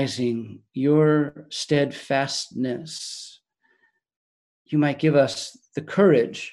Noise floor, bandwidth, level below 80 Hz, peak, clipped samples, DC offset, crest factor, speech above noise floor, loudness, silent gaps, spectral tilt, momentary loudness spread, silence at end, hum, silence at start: -67 dBFS; 12 kHz; -68 dBFS; -6 dBFS; under 0.1%; under 0.1%; 18 dB; 44 dB; -23 LUFS; 4.16-4.65 s; -5.5 dB/octave; 15 LU; 0 s; none; 0 s